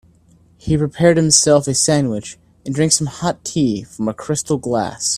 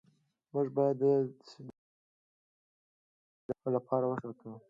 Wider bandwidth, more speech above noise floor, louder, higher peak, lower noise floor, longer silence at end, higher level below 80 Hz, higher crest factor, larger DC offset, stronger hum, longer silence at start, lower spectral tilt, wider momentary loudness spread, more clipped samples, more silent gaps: first, 14 kHz vs 7.4 kHz; second, 35 dB vs 39 dB; first, -16 LUFS vs -33 LUFS; first, 0 dBFS vs -16 dBFS; second, -51 dBFS vs -72 dBFS; about the same, 0 s vs 0.1 s; first, -44 dBFS vs -78 dBFS; about the same, 18 dB vs 20 dB; neither; neither; about the same, 0.65 s vs 0.55 s; second, -4 dB/octave vs -9.5 dB/octave; second, 14 LU vs 22 LU; neither; second, none vs 1.78-3.49 s